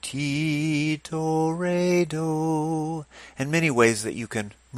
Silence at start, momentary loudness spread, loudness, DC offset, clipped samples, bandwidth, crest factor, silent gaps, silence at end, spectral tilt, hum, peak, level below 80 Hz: 0.05 s; 11 LU; -25 LUFS; under 0.1%; under 0.1%; 15.5 kHz; 20 dB; none; 0 s; -5.5 dB/octave; none; -4 dBFS; -58 dBFS